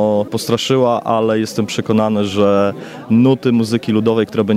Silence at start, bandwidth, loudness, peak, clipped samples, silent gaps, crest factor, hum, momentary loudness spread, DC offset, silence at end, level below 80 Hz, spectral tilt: 0 s; 15.5 kHz; -15 LUFS; -2 dBFS; under 0.1%; none; 12 dB; none; 5 LU; under 0.1%; 0 s; -58 dBFS; -6 dB/octave